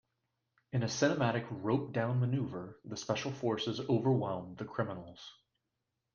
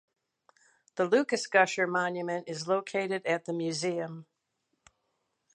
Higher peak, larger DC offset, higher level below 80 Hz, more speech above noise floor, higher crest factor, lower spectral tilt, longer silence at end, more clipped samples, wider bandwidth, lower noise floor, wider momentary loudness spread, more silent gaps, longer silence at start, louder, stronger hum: second, -16 dBFS vs -8 dBFS; neither; first, -72 dBFS vs -84 dBFS; about the same, 52 dB vs 51 dB; second, 18 dB vs 24 dB; first, -6 dB/octave vs -4 dB/octave; second, 0.85 s vs 1.3 s; neither; second, 7.2 kHz vs 11 kHz; first, -86 dBFS vs -80 dBFS; first, 14 LU vs 11 LU; neither; second, 0.75 s vs 0.95 s; second, -35 LUFS vs -29 LUFS; neither